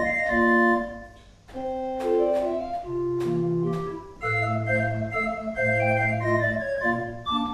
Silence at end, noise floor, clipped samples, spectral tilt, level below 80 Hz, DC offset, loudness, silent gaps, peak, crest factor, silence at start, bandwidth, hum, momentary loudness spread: 0 s; -47 dBFS; under 0.1%; -7 dB/octave; -50 dBFS; under 0.1%; -25 LUFS; none; -10 dBFS; 16 dB; 0 s; 11.5 kHz; none; 10 LU